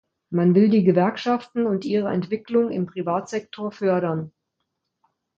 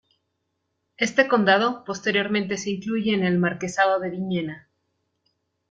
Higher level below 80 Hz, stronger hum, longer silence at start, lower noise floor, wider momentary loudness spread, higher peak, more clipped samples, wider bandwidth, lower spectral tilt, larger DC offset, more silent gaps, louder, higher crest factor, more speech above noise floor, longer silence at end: about the same, -66 dBFS vs -66 dBFS; neither; second, 0.3 s vs 1 s; about the same, -78 dBFS vs -76 dBFS; first, 12 LU vs 9 LU; about the same, -4 dBFS vs -4 dBFS; neither; second, 7.6 kHz vs 9 kHz; first, -8 dB/octave vs -5 dB/octave; neither; neither; about the same, -22 LUFS vs -23 LUFS; about the same, 18 dB vs 20 dB; about the same, 57 dB vs 54 dB; about the same, 1.1 s vs 1.1 s